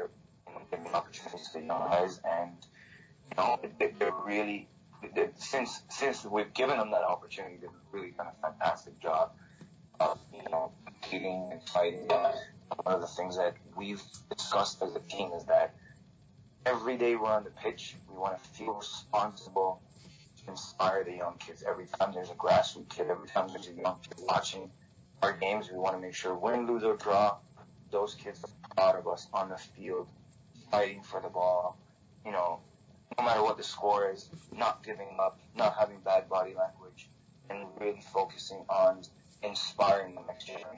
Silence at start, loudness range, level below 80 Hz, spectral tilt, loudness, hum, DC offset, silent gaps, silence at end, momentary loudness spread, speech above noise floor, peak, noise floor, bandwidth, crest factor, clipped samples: 0 s; 3 LU; -68 dBFS; -4 dB/octave; -33 LUFS; none; under 0.1%; none; 0 s; 15 LU; 27 dB; -14 dBFS; -59 dBFS; 8 kHz; 18 dB; under 0.1%